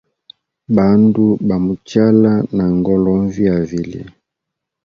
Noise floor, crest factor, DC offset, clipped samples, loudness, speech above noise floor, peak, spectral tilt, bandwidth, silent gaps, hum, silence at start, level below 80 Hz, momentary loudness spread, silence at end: -80 dBFS; 14 dB; under 0.1%; under 0.1%; -14 LUFS; 66 dB; 0 dBFS; -9 dB/octave; 7 kHz; none; none; 0.7 s; -42 dBFS; 9 LU; 0.75 s